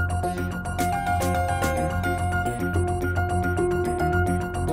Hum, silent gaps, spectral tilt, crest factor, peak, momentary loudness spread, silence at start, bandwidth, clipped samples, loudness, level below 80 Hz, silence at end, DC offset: none; none; -6 dB/octave; 14 dB; -10 dBFS; 3 LU; 0 s; 16 kHz; under 0.1%; -25 LUFS; -38 dBFS; 0 s; under 0.1%